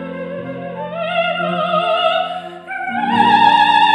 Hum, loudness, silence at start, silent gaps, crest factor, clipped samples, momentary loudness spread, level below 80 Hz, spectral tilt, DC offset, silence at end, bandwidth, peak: none; -15 LUFS; 0 s; none; 16 dB; under 0.1%; 16 LU; -60 dBFS; -5 dB/octave; under 0.1%; 0 s; 10 kHz; 0 dBFS